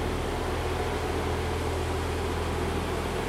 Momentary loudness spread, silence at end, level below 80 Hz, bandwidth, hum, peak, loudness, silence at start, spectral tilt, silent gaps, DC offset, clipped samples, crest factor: 1 LU; 0 s; -38 dBFS; 15.5 kHz; none; -16 dBFS; -30 LUFS; 0 s; -5.5 dB/octave; none; under 0.1%; under 0.1%; 12 dB